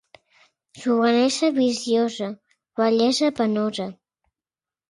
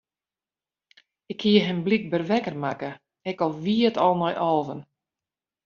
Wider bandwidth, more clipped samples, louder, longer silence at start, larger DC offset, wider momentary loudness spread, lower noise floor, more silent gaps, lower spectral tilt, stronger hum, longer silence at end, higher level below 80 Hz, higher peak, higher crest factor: first, 11.5 kHz vs 7 kHz; neither; about the same, -22 LUFS vs -24 LUFS; second, 0.75 s vs 1.3 s; neither; about the same, 13 LU vs 15 LU; about the same, under -90 dBFS vs under -90 dBFS; neither; about the same, -4 dB/octave vs -4.5 dB/octave; neither; about the same, 0.95 s vs 0.85 s; about the same, -70 dBFS vs -68 dBFS; about the same, -8 dBFS vs -6 dBFS; about the same, 16 dB vs 20 dB